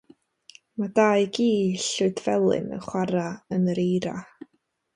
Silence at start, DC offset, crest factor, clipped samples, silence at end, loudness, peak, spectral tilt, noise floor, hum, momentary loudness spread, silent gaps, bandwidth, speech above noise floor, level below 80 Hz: 0.8 s; under 0.1%; 18 dB; under 0.1%; 0.7 s; -24 LUFS; -6 dBFS; -5.5 dB/octave; -54 dBFS; none; 10 LU; none; 11 kHz; 30 dB; -64 dBFS